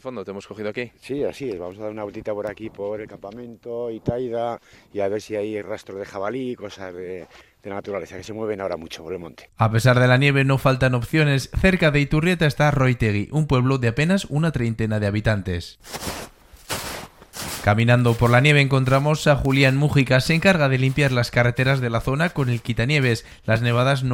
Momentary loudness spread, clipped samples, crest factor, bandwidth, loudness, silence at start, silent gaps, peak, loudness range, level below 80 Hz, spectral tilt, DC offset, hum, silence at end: 16 LU; under 0.1%; 20 dB; 16.5 kHz; -21 LUFS; 0.05 s; none; -2 dBFS; 12 LU; -40 dBFS; -6 dB/octave; under 0.1%; none; 0 s